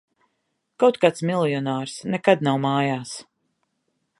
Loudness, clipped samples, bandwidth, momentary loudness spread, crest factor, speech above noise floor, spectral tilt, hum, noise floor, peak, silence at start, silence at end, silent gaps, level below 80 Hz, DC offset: -22 LUFS; under 0.1%; 11.5 kHz; 10 LU; 22 dB; 54 dB; -6 dB/octave; none; -75 dBFS; -2 dBFS; 0.8 s; 0.95 s; none; -72 dBFS; under 0.1%